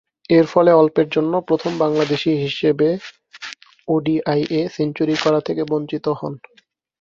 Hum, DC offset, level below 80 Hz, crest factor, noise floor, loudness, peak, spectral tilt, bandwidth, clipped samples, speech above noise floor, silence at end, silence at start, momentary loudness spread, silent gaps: none; under 0.1%; -60 dBFS; 18 dB; -37 dBFS; -18 LUFS; 0 dBFS; -6.5 dB/octave; 7.4 kHz; under 0.1%; 19 dB; 0.65 s; 0.3 s; 19 LU; none